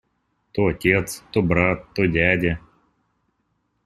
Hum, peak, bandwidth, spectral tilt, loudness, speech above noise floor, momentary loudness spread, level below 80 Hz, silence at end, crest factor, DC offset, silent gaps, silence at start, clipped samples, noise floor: none; -2 dBFS; 15 kHz; -6 dB/octave; -21 LUFS; 50 dB; 7 LU; -44 dBFS; 1.3 s; 22 dB; under 0.1%; none; 0.55 s; under 0.1%; -71 dBFS